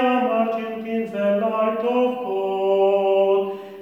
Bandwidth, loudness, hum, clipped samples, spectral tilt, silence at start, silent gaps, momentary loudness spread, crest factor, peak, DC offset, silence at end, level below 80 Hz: 13 kHz; -21 LUFS; none; under 0.1%; -7.5 dB/octave; 0 s; none; 8 LU; 12 dB; -8 dBFS; under 0.1%; 0 s; -74 dBFS